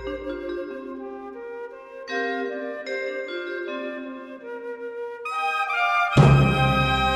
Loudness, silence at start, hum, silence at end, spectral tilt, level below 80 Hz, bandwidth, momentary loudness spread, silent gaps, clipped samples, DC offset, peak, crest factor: -23 LUFS; 0 s; none; 0 s; -6.5 dB/octave; -40 dBFS; 12 kHz; 19 LU; none; under 0.1%; under 0.1%; -4 dBFS; 20 dB